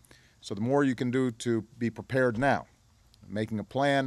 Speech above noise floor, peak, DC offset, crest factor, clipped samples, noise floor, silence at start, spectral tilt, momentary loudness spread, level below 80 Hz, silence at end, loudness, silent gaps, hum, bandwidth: 33 dB; -12 dBFS; under 0.1%; 18 dB; under 0.1%; -61 dBFS; 0.45 s; -6.5 dB/octave; 9 LU; -60 dBFS; 0 s; -29 LUFS; none; none; 12.5 kHz